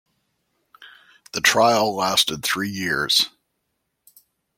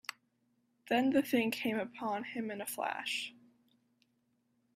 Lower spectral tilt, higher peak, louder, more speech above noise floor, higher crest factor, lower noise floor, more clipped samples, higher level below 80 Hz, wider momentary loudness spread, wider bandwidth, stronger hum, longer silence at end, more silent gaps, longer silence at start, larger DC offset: second, -2 dB/octave vs -3.5 dB/octave; first, -2 dBFS vs -18 dBFS; first, -19 LUFS vs -35 LUFS; first, 55 dB vs 43 dB; about the same, 22 dB vs 20 dB; about the same, -75 dBFS vs -77 dBFS; neither; first, -60 dBFS vs -80 dBFS; second, 7 LU vs 10 LU; about the same, 16.5 kHz vs 16 kHz; neither; second, 1.3 s vs 1.45 s; neither; first, 0.8 s vs 0.1 s; neither